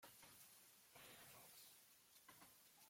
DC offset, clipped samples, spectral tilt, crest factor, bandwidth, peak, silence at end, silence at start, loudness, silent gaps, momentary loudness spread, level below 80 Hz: under 0.1%; under 0.1%; -1 dB/octave; 16 dB; 16.5 kHz; -50 dBFS; 0 s; 0 s; -64 LUFS; none; 5 LU; under -90 dBFS